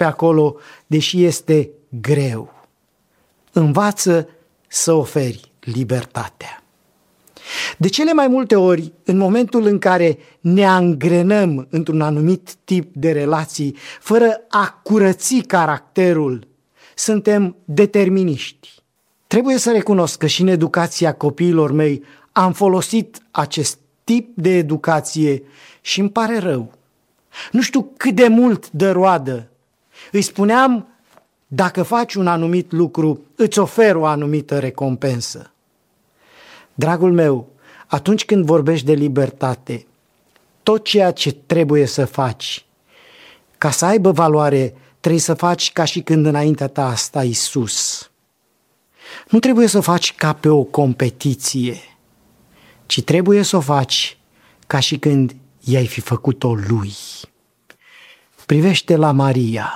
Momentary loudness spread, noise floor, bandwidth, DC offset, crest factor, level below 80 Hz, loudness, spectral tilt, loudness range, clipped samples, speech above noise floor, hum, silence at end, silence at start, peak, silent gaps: 11 LU; -64 dBFS; 16 kHz; under 0.1%; 16 dB; -60 dBFS; -16 LUFS; -5 dB/octave; 4 LU; under 0.1%; 48 dB; none; 0 s; 0 s; 0 dBFS; none